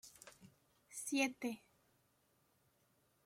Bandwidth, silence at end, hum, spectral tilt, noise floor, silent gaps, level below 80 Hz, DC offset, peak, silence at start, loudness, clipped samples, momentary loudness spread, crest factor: 16.5 kHz; 1.7 s; none; -2 dB/octave; -78 dBFS; none; -86 dBFS; under 0.1%; -24 dBFS; 0.05 s; -41 LUFS; under 0.1%; 21 LU; 22 dB